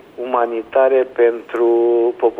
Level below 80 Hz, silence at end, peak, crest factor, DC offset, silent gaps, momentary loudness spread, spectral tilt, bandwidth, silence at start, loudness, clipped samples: -64 dBFS; 0 s; -4 dBFS; 12 dB; under 0.1%; none; 5 LU; -6.5 dB/octave; 3.8 kHz; 0.2 s; -16 LUFS; under 0.1%